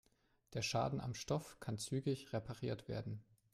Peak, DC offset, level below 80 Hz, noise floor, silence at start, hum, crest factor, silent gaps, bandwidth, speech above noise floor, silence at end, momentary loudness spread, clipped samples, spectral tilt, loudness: -26 dBFS; under 0.1%; -68 dBFS; -73 dBFS; 0.5 s; none; 16 dB; none; 15 kHz; 31 dB; 0.3 s; 9 LU; under 0.1%; -5 dB/octave; -43 LUFS